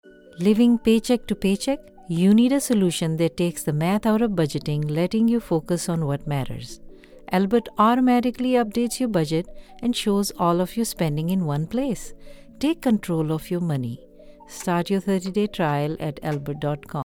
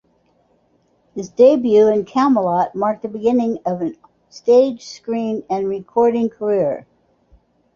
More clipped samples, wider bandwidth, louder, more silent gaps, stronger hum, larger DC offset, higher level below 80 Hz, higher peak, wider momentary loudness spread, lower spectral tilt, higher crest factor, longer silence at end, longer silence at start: neither; first, 17.5 kHz vs 7.2 kHz; second, -23 LUFS vs -17 LUFS; neither; neither; neither; first, -48 dBFS vs -60 dBFS; second, -6 dBFS vs -2 dBFS; second, 10 LU vs 13 LU; about the same, -6 dB/octave vs -7 dB/octave; about the same, 16 dB vs 16 dB; second, 0 s vs 0.95 s; second, 0.05 s vs 1.15 s